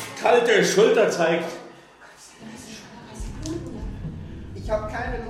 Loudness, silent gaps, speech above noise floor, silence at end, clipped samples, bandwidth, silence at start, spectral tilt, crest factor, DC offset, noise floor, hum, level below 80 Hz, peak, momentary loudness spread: -21 LUFS; none; 28 dB; 0 s; under 0.1%; 15.5 kHz; 0 s; -4 dB/octave; 18 dB; under 0.1%; -48 dBFS; none; -40 dBFS; -6 dBFS; 23 LU